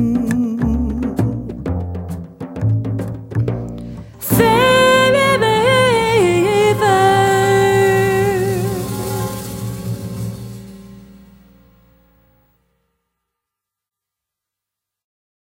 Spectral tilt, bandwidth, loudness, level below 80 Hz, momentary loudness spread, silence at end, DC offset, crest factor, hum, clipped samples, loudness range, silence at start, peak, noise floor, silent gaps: -5.5 dB/octave; 16.5 kHz; -16 LUFS; -36 dBFS; 16 LU; 4.3 s; under 0.1%; 16 dB; none; under 0.1%; 16 LU; 0 s; 0 dBFS; -84 dBFS; none